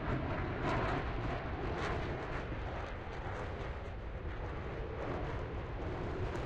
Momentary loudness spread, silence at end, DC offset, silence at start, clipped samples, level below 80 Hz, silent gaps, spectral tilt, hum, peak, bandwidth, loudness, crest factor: 7 LU; 0 s; under 0.1%; 0 s; under 0.1%; -44 dBFS; none; -7 dB/octave; none; -22 dBFS; 8.8 kHz; -40 LUFS; 16 dB